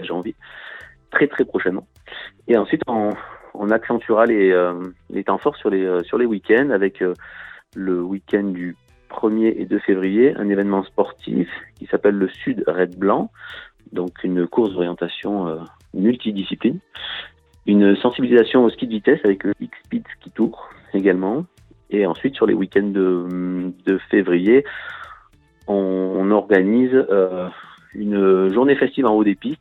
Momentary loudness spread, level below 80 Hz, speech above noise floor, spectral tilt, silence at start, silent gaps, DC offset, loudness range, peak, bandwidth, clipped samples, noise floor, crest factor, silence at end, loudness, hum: 17 LU; -58 dBFS; 33 dB; -9 dB/octave; 0 s; none; under 0.1%; 4 LU; -2 dBFS; 4.3 kHz; under 0.1%; -52 dBFS; 18 dB; 0.05 s; -19 LUFS; none